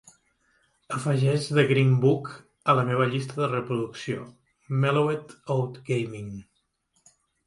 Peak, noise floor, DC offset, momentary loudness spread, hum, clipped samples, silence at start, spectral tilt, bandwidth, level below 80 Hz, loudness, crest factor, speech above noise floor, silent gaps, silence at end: -6 dBFS; -71 dBFS; under 0.1%; 14 LU; none; under 0.1%; 0.9 s; -7 dB/octave; 11.5 kHz; -64 dBFS; -25 LUFS; 20 dB; 47 dB; none; 1.05 s